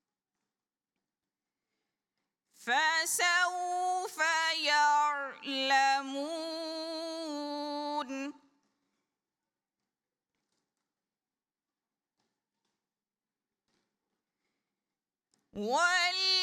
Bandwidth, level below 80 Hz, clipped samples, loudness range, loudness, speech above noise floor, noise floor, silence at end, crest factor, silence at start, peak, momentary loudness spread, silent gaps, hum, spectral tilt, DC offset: 17 kHz; -84 dBFS; under 0.1%; 13 LU; -30 LUFS; over 61 dB; under -90 dBFS; 0 s; 20 dB; 2.6 s; -16 dBFS; 12 LU; none; none; -0.5 dB/octave; under 0.1%